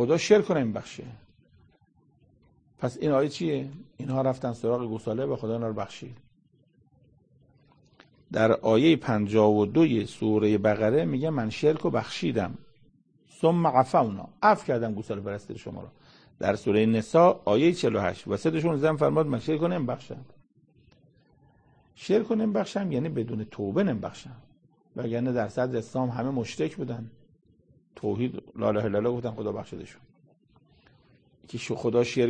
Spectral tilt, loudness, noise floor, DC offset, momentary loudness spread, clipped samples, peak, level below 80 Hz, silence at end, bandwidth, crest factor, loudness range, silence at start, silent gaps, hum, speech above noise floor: -7 dB/octave; -26 LUFS; -64 dBFS; under 0.1%; 16 LU; under 0.1%; -6 dBFS; -62 dBFS; 0 s; 9.8 kHz; 22 dB; 8 LU; 0 s; none; none; 39 dB